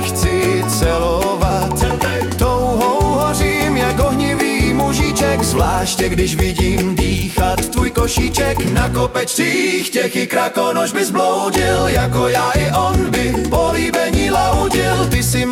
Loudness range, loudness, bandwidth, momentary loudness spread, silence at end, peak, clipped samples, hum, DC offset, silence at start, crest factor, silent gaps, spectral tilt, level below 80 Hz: 1 LU; -16 LUFS; 18 kHz; 2 LU; 0 s; -4 dBFS; under 0.1%; none; under 0.1%; 0 s; 12 dB; none; -4.5 dB/octave; -26 dBFS